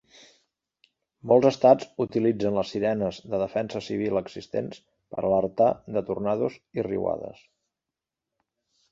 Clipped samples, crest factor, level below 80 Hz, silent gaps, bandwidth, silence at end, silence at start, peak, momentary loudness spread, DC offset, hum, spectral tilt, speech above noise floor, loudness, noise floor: under 0.1%; 22 dB; -60 dBFS; none; 7.6 kHz; 1.6 s; 1.25 s; -4 dBFS; 12 LU; under 0.1%; none; -7 dB/octave; 63 dB; -25 LUFS; -88 dBFS